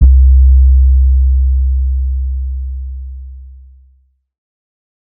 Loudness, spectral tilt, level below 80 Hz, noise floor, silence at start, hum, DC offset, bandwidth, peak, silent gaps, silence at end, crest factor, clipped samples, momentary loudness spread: -12 LUFS; -17.5 dB/octave; -10 dBFS; -52 dBFS; 0 s; none; under 0.1%; 0.3 kHz; 0 dBFS; none; 1.55 s; 10 dB; 0.3%; 19 LU